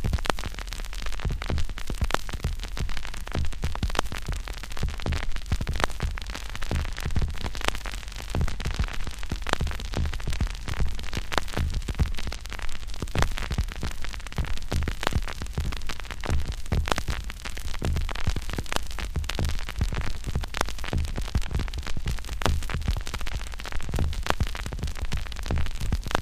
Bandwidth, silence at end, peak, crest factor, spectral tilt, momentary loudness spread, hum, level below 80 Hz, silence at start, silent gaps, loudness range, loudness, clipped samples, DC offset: 15.5 kHz; 0 s; 0 dBFS; 26 dB; -4.5 dB/octave; 7 LU; none; -30 dBFS; 0 s; none; 1 LU; -31 LUFS; under 0.1%; 0.2%